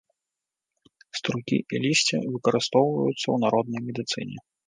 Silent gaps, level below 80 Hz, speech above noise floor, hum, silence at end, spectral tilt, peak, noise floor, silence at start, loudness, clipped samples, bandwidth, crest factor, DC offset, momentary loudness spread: none; -70 dBFS; 62 dB; none; 0.3 s; -4.5 dB/octave; -6 dBFS; -87 dBFS; 1.15 s; -25 LUFS; under 0.1%; 10 kHz; 20 dB; under 0.1%; 9 LU